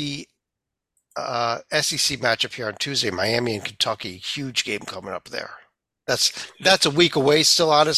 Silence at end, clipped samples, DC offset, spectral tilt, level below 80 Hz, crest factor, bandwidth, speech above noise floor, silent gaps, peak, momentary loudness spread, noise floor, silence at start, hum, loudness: 0 s; under 0.1%; under 0.1%; -2.5 dB/octave; -58 dBFS; 20 dB; 15.5 kHz; 62 dB; none; -2 dBFS; 16 LU; -84 dBFS; 0 s; none; -21 LUFS